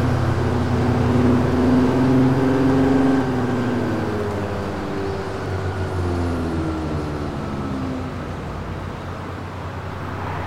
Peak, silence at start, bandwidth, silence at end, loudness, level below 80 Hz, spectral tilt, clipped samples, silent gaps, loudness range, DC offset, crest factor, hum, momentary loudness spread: -6 dBFS; 0 s; 12 kHz; 0 s; -21 LUFS; -36 dBFS; -8 dB/octave; under 0.1%; none; 10 LU; 1%; 14 dB; none; 13 LU